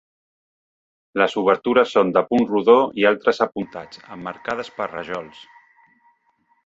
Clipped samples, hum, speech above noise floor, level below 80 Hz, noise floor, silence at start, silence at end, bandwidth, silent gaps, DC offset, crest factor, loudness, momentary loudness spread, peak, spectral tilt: under 0.1%; none; 45 dB; -62 dBFS; -65 dBFS; 1.15 s; 1.4 s; 7.8 kHz; none; under 0.1%; 20 dB; -19 LUFS; 17 LU; -2 dBFS; -6 dB/octave